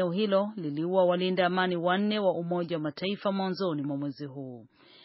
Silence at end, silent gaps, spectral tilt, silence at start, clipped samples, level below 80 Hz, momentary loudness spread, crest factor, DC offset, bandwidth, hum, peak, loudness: 0.4 s; none; -4.5 dB/octave; 0 s; under 0.1%; -78 dBFS; 12 LU; 16 dB; under 0.1%; 5.8 kHz; none; -12 dBFS; -29 LUFS